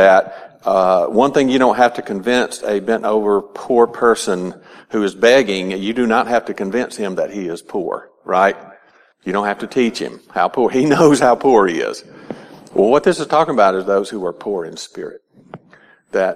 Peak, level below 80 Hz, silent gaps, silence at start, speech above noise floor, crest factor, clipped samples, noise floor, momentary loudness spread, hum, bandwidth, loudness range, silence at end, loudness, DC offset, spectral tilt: 0 dBFS; -56 dBFS; none; 0 s; 35 dB; 16 dB; under 0.1%; -50 dBFS; 15 LU; none; 13.5 kHz; 5 LU; 0 s; -16 LUFS; under 0.1%; -5 dB/octave